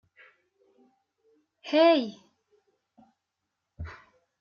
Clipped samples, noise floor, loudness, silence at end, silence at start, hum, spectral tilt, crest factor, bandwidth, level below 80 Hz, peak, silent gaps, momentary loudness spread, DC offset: under 0.1%; -84 dBFS; -24 LUFS; 0.45 s; 1.65 s; none; -6 dB/octave; 22 dB; 6.8 kHz; -60 dBFS; -10 dBFS; none; 23 LU; under 0.1%